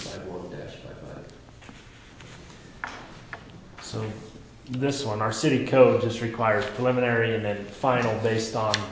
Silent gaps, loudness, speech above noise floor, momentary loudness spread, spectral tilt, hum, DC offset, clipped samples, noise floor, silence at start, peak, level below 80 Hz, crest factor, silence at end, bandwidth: none; -25 LUFS; 23 dB; 23 LU; -5.5 dB/octave; none; under 0.1%; under 0.1%; -47 dBFS; 0 s; -4 dBFS; -54 dBFS; 24 dB; 0 s; 8 kHz